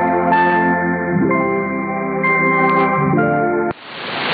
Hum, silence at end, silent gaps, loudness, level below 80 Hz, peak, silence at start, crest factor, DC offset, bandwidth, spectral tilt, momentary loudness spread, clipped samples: none; 0 s; none; -16 LUFS; -52 dBFS; -2 dBFS; 0 s; 14 dB; under 0.1%; 5 kHz; -12 dB/octave; 7 LU; under 0.1%